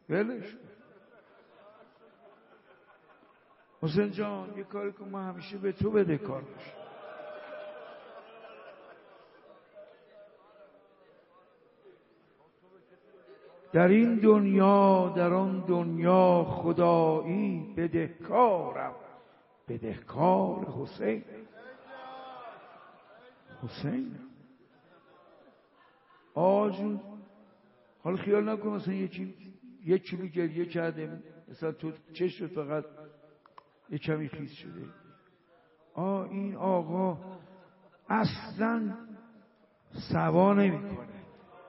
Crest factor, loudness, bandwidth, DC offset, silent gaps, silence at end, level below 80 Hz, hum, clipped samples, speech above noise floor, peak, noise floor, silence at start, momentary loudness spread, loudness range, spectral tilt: 22 dB; -29 LUFS; 5.8 kHz; under 0.1%; none; 0.05 s; -68 dBFS; none; under 0.1%; 36 dB; -10 dBFS; -64 dBFS; 0.1 s; 25 LU; 17 LU; -7 dB/octave